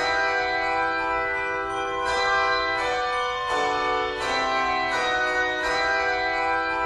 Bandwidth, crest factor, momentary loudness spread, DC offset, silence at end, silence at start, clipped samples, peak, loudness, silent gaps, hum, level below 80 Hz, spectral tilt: 12 kHz; 14 dB; 3 LU; under 0.1%; 0 s; 0 s; under 0.1%; -10 dBFS; -23 LUFS; none; none; -48 dBFS; -2.5 dB/octave